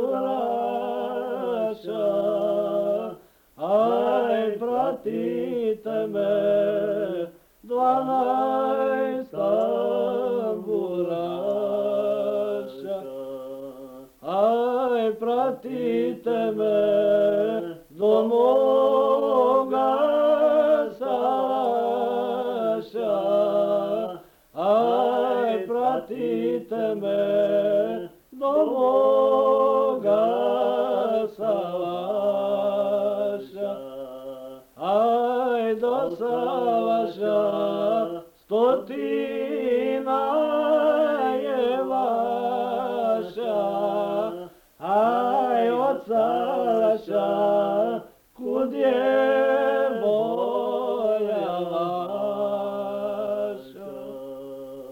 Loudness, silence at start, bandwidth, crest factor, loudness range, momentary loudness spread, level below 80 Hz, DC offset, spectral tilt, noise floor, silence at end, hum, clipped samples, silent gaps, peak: -23 LUFS; 0 s; 16.5 kHz; 14 dB; 5 LU; 11 LU; -66 dBFS; under 0.1%; -7 dB/octave; -46 dBFS; 0 s; none; under 0.1%; none; -8 dBFS